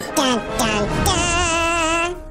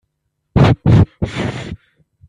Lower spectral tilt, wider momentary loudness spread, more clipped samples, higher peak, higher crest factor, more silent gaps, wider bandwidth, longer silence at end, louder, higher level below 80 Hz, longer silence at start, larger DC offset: second, -3 dB/octave vs -8 dB/octave; second, 3 LU vs 18 LU; neither; about the same, -4 dBFS vs -2 dBFS; about the same, 14 dB vs 14 dB; neither; first, 16 kHz vs 9.8 kHz; second, 0 s vs 0.55 s; second, -18 LUFS vs -15 LUFS; about the same, -32 dBFS vs -32 dBFS; second, 0 s vs 0.55 s; neither